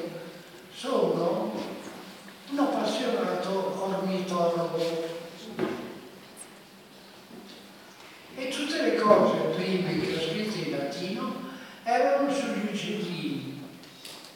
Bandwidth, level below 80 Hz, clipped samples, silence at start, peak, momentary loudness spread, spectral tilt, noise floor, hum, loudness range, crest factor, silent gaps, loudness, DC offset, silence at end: 17.5 kHz; -72 dBFS; under 0.1%; 0 s; -4 dBFS; 21 LU; -5.5 dB/octave; -50 dBFS; none; 9 LU; 26 dB; none; -28 LUFS; under 0.1%; 0 s